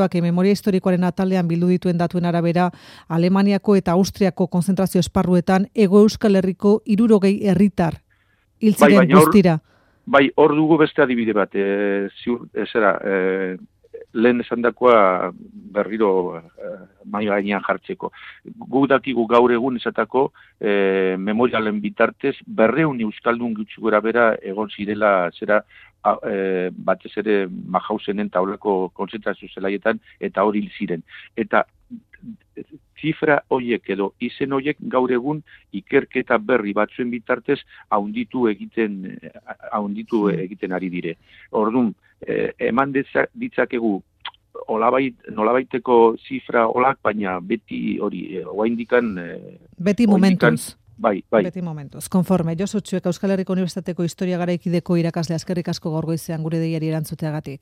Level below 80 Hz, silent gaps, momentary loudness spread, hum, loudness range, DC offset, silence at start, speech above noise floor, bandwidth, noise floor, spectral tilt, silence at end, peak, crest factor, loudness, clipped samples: -54 dBFS; none; 12 LU; none; 8 LU; under 0.1%; 0 s; 42 dB; 15.5 kHz; -61 dBFS; -7 dB/octave; 0.05 s; 0 dBFS; 20 dB; -20 LUFS; under 0.1%